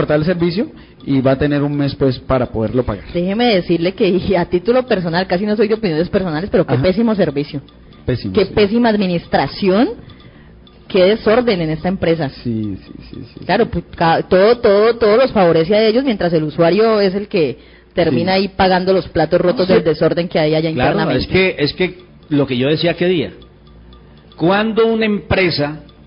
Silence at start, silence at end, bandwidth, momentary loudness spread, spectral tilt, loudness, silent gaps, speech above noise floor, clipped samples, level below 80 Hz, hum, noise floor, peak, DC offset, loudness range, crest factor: 0 s; 0.25 s; 5.4 kHz; 9 LU; -11 dB/octave; -15 LUFS; none; 27 dB; under 0.1%; -38 dBFS; none; -41 dBFS; -2 dBFS; under 0.1%; 4 LU; 14 dB